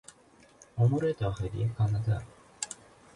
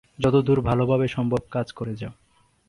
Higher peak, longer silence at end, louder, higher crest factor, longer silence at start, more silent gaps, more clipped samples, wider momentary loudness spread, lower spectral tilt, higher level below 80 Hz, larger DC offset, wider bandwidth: second, -14 dBFS vs -8 dBFS; second, 0.4 s vs 0.55 s; second, -31 LUFS vs -23 LUFS; about the same, 18 dB vs 16 dB; first, 0.75 s vs 0.2 s; neither; neither; first, 15 LU vs 12 LU; second, -6.5 dB/octave vs -8.5 dB/octave; second, -52 dBFS vs -46 dBFS; neither; about the same, 11.5 kHz vs 11 kHz